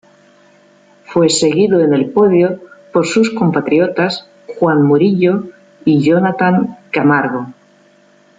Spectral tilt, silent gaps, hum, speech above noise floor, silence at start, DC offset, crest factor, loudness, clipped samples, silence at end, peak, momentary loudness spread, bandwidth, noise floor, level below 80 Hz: -5.5 dB/octave; none; none; 37 dB; 1.1 s; under 0.1%; 12 dB; -13 LUFS; under 0.1%; 0.85 s; -2 dBFS; 9 LU; 9.4 kHz; -49 dBFS; -58 dBFS